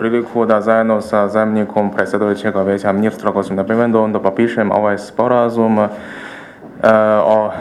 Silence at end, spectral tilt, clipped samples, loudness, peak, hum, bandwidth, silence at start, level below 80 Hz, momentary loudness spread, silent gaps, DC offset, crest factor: 0 s; -7.5 dB/octave; under 0.1%; -15 LUFS; 0 dBFS; none; 12 kHz; 0 s; -56 dBFS; 6 LU; none; under 0.1%; 14 dB